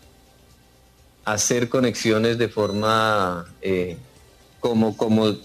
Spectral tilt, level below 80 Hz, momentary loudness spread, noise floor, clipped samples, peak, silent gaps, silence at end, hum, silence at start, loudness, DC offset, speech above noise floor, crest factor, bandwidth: -4.5 dB/octave; -56 dBFS; 9 LU; -54 dBFS; under 0.1%; -6 dBFS; none; 0 s; 60 Hz at -50 dBFS; 1.25 s; -22 LUFS; under 0.1%; 33 dB; 16 dB; 14.5 kHz